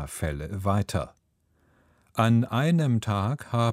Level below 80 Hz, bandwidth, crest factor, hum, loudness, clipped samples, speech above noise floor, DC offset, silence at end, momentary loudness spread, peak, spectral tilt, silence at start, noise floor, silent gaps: -46 dBFS; 15 kHz; 20 dB; none; -26 LUFS; under 0.1%; 43 dB; under 0.1%; 0 s; 9 LU; -6 dBFS; -6.5 dB/octave; 0 s; -68 dBFS; none